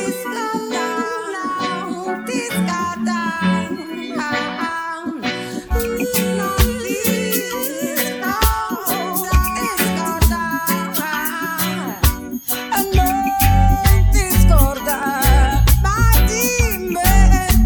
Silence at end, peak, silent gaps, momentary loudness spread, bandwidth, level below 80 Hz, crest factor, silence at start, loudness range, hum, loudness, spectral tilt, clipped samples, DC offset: 0 s; 0 dBFS; none; 9 LU; over 20 kHz; -20 dBFS; 16 dB; 0 s; 6 LU; none; -18 LUFS; -4.5 dB/octave; under 0.1%; under 0.1%